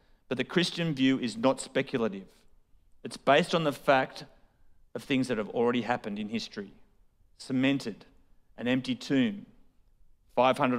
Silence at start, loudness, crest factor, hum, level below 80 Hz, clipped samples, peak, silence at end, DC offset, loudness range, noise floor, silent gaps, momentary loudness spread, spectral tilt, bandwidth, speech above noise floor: 0.3 s; -29 LUFS; 22 dB; none; -64 dBFS; under 0.1%; -10 dBFS; 0 s; under 0.1%; 4 LU; -62 dBFS; none; 19 LU; -5.5 dB/octave; 14 kHz; 34 dB